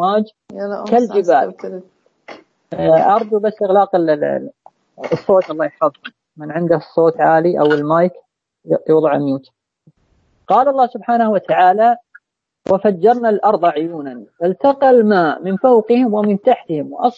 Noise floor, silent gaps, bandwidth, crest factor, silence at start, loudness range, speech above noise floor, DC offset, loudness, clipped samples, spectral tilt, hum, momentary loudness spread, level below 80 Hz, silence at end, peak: -59 dBFS; none; 7.6 kHz; 14 dB; 0 s; 3 LU; 45 dB; under 0.1%; -15 LUFS; under 0.1%; -8 dB/octave; none; 13 LU; -62 dBFS; 0.05 s; -2 dBFS